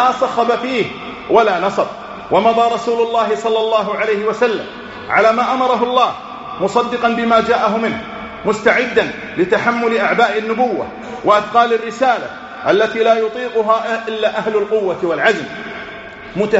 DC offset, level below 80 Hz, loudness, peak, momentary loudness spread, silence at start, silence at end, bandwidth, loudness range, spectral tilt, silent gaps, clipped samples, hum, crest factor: under 0.1%; -52 dBFS; -15 LUFS; 0 dBFS; 12 LU; 0 s; 0 s; 8 kHz; 1 LU; -2.5 dB/octave; none; under 0.1%; none; 16 dB